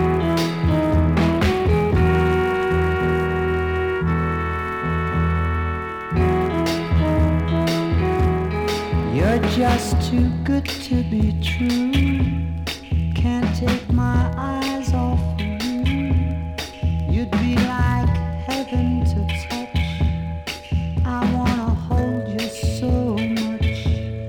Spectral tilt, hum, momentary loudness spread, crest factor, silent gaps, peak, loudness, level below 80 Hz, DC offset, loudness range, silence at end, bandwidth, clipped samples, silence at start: -7 dB/octave; none; 6 LU; 14 dB; none; -6 dBFS; -21 LUFS; -28 dBFS; under 0.1%; 3 LU; 0 s; 17 kHz; under 0.1%; 0 s